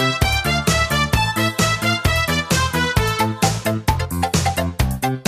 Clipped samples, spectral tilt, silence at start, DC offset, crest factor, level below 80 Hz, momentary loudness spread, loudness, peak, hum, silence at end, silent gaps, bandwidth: under 0.1%; -4 dB/octave; 0 s; under 0.1%; 16 dB; -28 dBFS; 4 LU; -18 LUFS; -2 dBFS; none; 0.05 s; none; 15.5 kHz